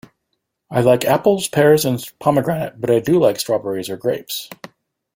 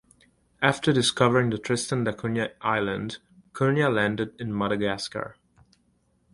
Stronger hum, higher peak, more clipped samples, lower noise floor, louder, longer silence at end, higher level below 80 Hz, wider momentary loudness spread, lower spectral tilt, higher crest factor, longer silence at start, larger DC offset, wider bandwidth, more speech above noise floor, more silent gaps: neither; about the same, -2 dBFS vs -4 dBFS; neither; first, -74 dBFS vs -67 dBFS; first, -17 LUFS vs -25 LUFS; second, 0.6 s vs 1 s; about the same, -56 dBFS vs -58 dBFS; about the same, 11 LU vs 12 LU; about the same, -5.5 dB/octave vs -5 dB/octave; second, 16 dB vs 24 dB; about the same, 0.7 s vs 0.6 s; neither; first, 16.5 kHz vs 11.5 kHz; first, 57 dB vs 42 dB; neither